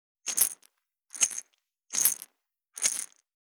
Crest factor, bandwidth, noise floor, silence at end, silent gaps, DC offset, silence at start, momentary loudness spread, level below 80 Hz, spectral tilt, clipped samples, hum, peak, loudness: 30 dB; over 20 kHz; -75 dBFS; 0.45 s; none; under 0.1%; 0.25 s; 20 LU; under -90 dBFS; 2.5 dB/octave; under 0.1%; none; -4 dBFS; -27 LUFS